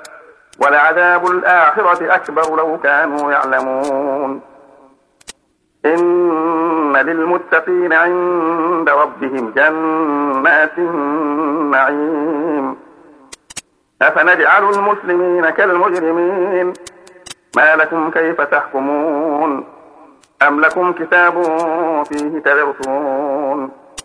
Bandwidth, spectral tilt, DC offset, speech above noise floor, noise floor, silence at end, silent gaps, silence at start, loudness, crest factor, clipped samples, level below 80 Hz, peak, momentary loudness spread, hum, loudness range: 11 kHz; -5 dB/octave; under 0.1%; 47 dB; -60 dBFS; 0.05 s; none; 0 s; -14 LUFS; 14 dB; under 0.1%; -64 dBFS; 0 dBFS; 9 LU; none; 4 LU